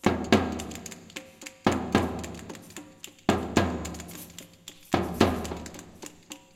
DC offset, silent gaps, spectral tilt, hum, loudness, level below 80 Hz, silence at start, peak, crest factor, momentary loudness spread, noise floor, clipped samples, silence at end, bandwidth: under 0.1%; none; -5 dB/octave; none; -28 LUFS; -48 dBFS; 0.05 s; -4 dBFS; 26 dB; 20 LU; -49 dBFS; under 0.1%; 0.2 s; 17 kHz